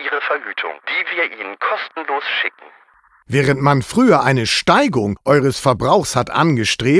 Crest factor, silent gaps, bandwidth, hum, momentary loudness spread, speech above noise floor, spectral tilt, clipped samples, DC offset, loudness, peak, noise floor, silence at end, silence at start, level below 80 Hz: 16 dB; none; 11 kHz; none; 9 LU; 36 dB; -5 dB/octave; under 0.1%; under 0.1%; -17 LUFS; -2 dBFS; -52 dBFS; 0 s; 0 s; -48 dBFS